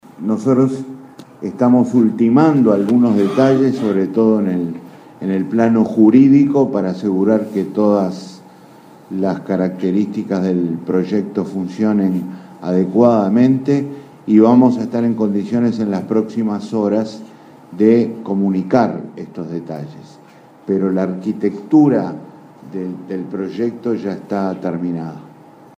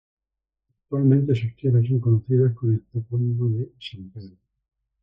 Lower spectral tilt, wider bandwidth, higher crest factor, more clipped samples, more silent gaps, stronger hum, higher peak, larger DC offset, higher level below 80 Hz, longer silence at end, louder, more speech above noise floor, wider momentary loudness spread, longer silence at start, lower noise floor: about the same, -9 dB/octave vs -10 dB/octave; first, 9 kHz vs 5.4 kHz; about the same, 16 dB vs 16 dB; neither; neither; neither; first, 0 dBFS vs -6 dBFS; neither; about the same, -62 dBFS vs -60 dBFS; second, 0.5 s vs 0.75 s; first, -16 LUFS vs -22 LUFS; second, 28 dB vs 65 dB; about the same, 16 LU vs 18 LU; second, 0.2 s vs 0.9 s; second, -43 dBFS vs -86 dBFS